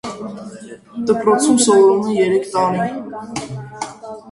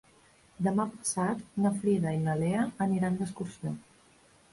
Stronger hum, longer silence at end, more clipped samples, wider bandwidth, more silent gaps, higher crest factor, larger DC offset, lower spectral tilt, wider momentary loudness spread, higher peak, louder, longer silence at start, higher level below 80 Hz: neither; second, 0 s vs 0.7 s; neither; about the same, 11.5 kHz vs 11.5 kHz; neither; about the same, 16 dB vs 14 dB; neither; second, -4.5 dB/octave vs -6.5 dB/octave; first, 21 LU vs 9 LU; first, -2 dBFS vs -16 dBFS; first, -15 LUFS vs -31 LUFS; second, 0.05 s vs 0.6 s; first, -56 dBFS vs -62 dBFS